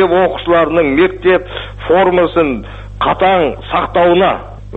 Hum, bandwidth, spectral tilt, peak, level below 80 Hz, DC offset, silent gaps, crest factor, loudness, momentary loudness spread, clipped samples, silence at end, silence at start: 50 Hz at -30 dBFS; 4.1 kHz; -8 dB/octave; 0 dBFS; -32 dBFS; under 0.1%; none; 12 dB; -12 LUFS; 11 LU; under 0.1%; 0 s; 0 s